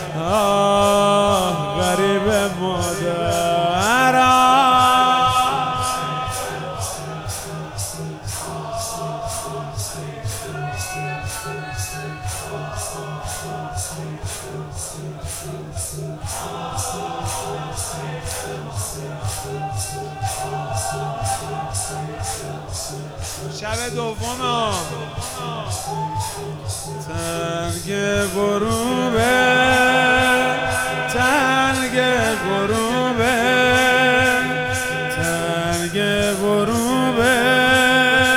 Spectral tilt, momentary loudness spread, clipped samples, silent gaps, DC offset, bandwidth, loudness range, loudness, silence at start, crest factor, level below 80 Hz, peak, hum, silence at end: -3.5 dB/octave; 14 LU; under 0.1%; none; under 0.1%; 19 kHz; 11 LU; -20 LUFS; 0 s; 18 dB; -42 dBFS; -2 dBFS; none; 0 s